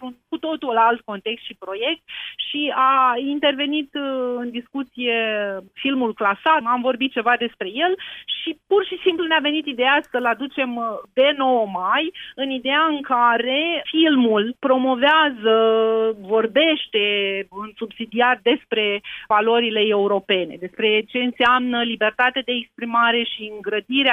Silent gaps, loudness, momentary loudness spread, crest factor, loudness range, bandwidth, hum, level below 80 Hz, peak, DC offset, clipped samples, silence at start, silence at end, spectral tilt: none; -20 LUFS; 11 LU; 16 dB; 4 LU; 4.3 kHz; none; -64 dBFS; -4 dBFS; under 0.1%; under 0.1%; 0 s; 0 s; -6 dB/octave